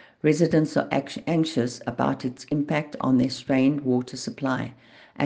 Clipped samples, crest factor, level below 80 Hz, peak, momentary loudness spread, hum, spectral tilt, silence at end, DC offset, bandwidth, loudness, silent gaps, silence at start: under 0.1%; 18 dB; -62 dBFS; -6 dBFS; 8 LU; none; -6.5 dB/octave; 0 s; under 0.1%; 9.6 kHz; -25 LUFS; none; 0.25 s